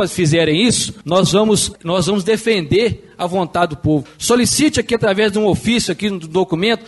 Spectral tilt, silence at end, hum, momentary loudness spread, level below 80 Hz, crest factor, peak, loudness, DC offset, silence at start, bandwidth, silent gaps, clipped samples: -4.5 dB/octave; 0 s; none; 6 LU; -42 dBFS; 14 dB; -2 dBFS; -16 LUFS; under 0.1%; 0 s; 12 kHz; none; under 0.1%